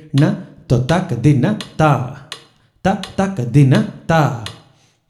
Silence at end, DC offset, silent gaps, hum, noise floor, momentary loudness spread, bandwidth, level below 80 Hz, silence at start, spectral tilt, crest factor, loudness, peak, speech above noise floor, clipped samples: 0.55 s; under 0.1%; none; none; -52 dBFS; 14 LU; 12 kHz; -44 dBFS; 0.15 s; -7 dB/octave; 16 dB; -16 LUFS; 0 dBFS; 37 dB; under 0.1%